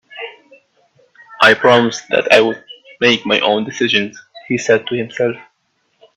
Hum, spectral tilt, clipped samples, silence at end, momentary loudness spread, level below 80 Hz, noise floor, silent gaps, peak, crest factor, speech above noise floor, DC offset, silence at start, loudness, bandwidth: none; -4 dB/octave; under 0.1%; 0.75 s; 18 LU; -58 dBFS; -65 dBFS; none; 0 dBFS; 16 dB; 50 dB; under 0.1%; 0.1 s; -14 LUFS; 13 kHz